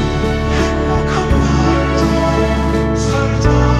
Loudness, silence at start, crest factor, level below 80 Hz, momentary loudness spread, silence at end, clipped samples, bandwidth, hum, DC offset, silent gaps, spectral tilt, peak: -15 LUFS; 0 s; 14 dB; -20 dBFS; 3 LU; 0 s; under 0.1%; 12 kHz; none; under 0.1%; none; -6.5 dB/octave; 0 dBFS